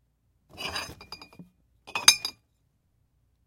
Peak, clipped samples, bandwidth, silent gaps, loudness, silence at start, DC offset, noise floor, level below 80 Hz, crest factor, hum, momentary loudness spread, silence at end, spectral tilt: 0 dBFS; under 0.1%; 16.5 kHz; none; -24 LUFS; 0.55 s; under 0.1%; -71 dBFS; -64 dBFS; 32 dB; none; 25 LU; 1.15 s; 1 dB/octave